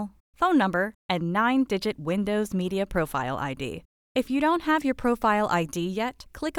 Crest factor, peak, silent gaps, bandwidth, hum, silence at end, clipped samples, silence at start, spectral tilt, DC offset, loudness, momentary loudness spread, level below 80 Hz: 16 dB; -10 dBFS; 0.20-0.33 s, 0.95-1.09 s, 3.85-4.15 s; 18.5 kHz; none; 0 s; under 0.1%; 0 s; -6 dB/octave; under 0.1%; -26 LUFS; 9 LU; -52 dBFS